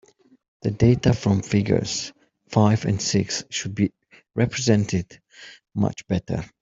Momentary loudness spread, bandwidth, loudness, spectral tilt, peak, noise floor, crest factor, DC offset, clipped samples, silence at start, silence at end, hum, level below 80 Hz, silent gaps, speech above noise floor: 14 LU; 7.8 kHz; -23 LUFS; -5.5 dB/octave; -4 dBFS; -47 dBFS; 20 dB; under 0.1%; under 0.1%; 0.65 s; 0.15 s; none; -48 dBFS; none; 26 dB